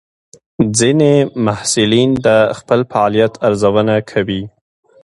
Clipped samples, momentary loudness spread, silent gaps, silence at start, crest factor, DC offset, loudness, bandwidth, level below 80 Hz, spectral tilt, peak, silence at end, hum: under 0.1%; 7 LU; none; 0.6 s; 14 dB; under 0.1%; -13 LUFS; 11.5 kHz; -46 dBFS; -5 dB/octave; 0 dBFS; 0.55 s; none